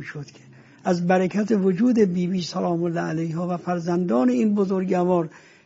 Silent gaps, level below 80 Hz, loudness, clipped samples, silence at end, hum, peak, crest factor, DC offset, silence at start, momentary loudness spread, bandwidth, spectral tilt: none; -64 dBFS; -22 LUFS; under 0.1%; 0.3 s; none; -6 dBFS; 16 dB; under 0.1%; 0 s; 8 LU; 7.8 kHz; -7 dB/octave